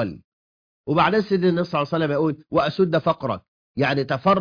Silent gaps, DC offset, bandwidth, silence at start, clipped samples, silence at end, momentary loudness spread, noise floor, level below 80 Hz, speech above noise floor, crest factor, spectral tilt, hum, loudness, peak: 0.24-0.84 s, 3.48-3.74 s; under 0.1%; 5.2 kHz; 0 s; under 0.1%; 0 s; 10 LU; under -90 dBFS; -56 dBFS; over 69 dB; 16 dB; -8 dB/octave; none; -22 LUFS; -6 dBFS